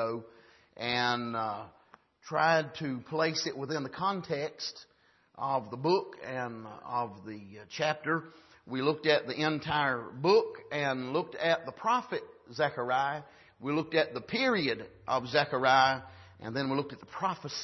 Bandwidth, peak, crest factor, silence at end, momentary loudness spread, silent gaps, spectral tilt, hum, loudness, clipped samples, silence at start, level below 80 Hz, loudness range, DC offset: 6.2 kHz; -10 dBFS; 22 dB; 0 s; 13 LU; none; -4.5 dB/octave; none; -31 LUFS; under 0.1%; 0 s; -70 dBFS; 5 LU; under 0.1%